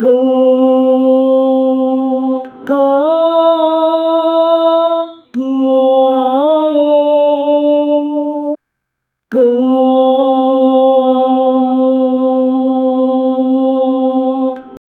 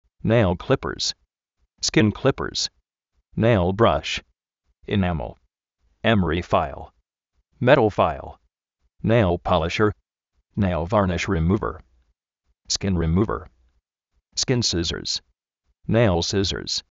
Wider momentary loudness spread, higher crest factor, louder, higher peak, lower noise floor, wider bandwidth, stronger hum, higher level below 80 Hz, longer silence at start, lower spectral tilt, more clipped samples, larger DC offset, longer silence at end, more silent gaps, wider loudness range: second, 7 LU vs 12 LU; second, 12 dB vs 22 dB; first, -12 LUFS vs -22 LUFS; about the same, 0 dBFS vs -2 dBFS; about the same, -74 dBFS vs -73 dBFS; second, 4.2 kHz vs 8 kHz; neither; second, -66 dBFS vs -40 dBFS; second, 0 s vs 0.25 s; first, -7 dB/octave vs -4.5 dB/octave; neither; neither; about the same, 0.2 s vs 0.1 s; neither; about the same, 2 LU vs 3 LU